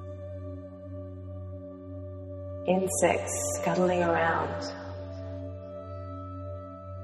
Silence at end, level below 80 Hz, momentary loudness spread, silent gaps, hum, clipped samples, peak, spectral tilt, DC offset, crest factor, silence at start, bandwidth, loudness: 0 s; -60 dBFS; 16 LU; none; none; under 0.1%; -10 dBFS; -5 dB/octave; under 0.1%; 22 dB; 0 s; 13 kHz; -31 LUFS